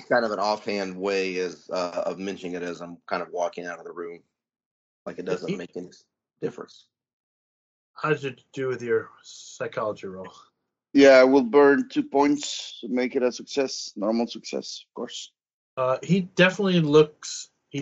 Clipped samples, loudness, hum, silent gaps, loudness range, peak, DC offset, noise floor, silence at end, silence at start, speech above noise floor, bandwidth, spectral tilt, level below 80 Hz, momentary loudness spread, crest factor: under 0.1%; -24 LUFS; none; 4.66-5.06 s, 7.13-7.94 s, 15.53-15.77 s; 15 LU; -4 dBFS; under 0.1%; under -90 dBFS; 0 s; 0 s; over 66 dB; 8 kHz; -4 dB/octave; -70 dBFS; 21 LU; 22 dB